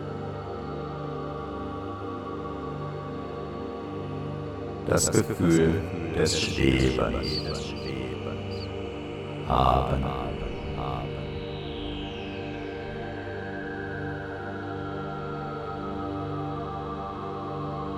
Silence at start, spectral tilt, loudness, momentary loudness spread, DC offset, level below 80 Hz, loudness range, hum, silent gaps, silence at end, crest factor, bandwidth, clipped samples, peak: 0 s; -5 dB/octave; -30 LUFS; 12 LU; under 0.1%; -42 dBFS; 10 LU; none; none; 0 s; 24 dB; 17 kHz; under 0.1%; -6 dBFS